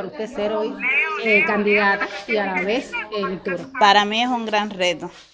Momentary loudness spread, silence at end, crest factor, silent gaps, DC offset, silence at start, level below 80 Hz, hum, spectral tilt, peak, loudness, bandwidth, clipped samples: 11 LU; 0.1 s; 20 dB; none; under 0.1%; 0 s; -58 dBFS; none; -4 dB/octave; -2 dBFS; -19 LUFS; 9.8 kHz; under 0.1%